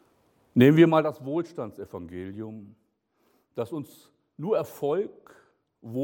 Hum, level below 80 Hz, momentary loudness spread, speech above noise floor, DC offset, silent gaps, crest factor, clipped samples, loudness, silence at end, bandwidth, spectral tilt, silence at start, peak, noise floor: none; -68 dBFS; 21 LU; 45 dB; under 0.1%; none; 20 dB; under 0.1%; -24 LUFS; 0 s; 17.5 kHz; -8 dB/octave; 0.55 s; -6 dBFS; -70 dBFS